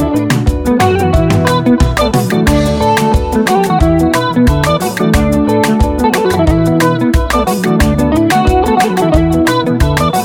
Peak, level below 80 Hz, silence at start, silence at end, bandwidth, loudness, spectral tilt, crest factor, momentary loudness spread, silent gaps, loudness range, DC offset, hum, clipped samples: 0 dBFS; -20 dBFS; 0 s; 0 s; over 20 kHz; -11 LUFS; -6 dB/octave; 10 dB; 2 LU; none; 0 LU; under 0.1%; none; under 0.1%